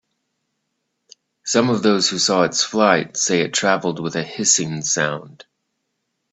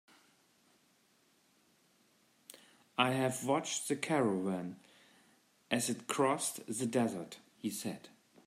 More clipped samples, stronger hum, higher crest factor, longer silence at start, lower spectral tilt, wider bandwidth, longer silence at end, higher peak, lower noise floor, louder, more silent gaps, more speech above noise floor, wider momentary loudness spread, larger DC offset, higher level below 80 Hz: neither; neither; second, 20 dB vs 26 dB; second, 1.45 s vs 2.55 s; second, -2.5 dB/octave vs -4 dB/octave; second, 8.4 kHz vs 16 kHz; first, 1 s vs 0.4 s; first, 0 dBFS vs -12 dBFS; about the same, -74 dBFS vs -71 dBFS; first, -18 LUFS vs -35 LUFS; neither; first, 56 dB vs 36 dB; second, 7 LU vs 18 LU; neither; first, -62 dBFS vs -82 dBFS